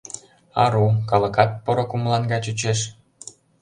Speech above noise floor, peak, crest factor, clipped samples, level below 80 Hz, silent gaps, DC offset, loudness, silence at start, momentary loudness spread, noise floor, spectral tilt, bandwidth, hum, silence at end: 24 dB; -2 dBFS; 20 dB; under 0.1%; -52 dBFS; none; under 0.1%; -21 LUFS; 0.15 s; 21 LU; -44 dBFS; -5 dB/octave; 10.5 kHz; none; 0.3 s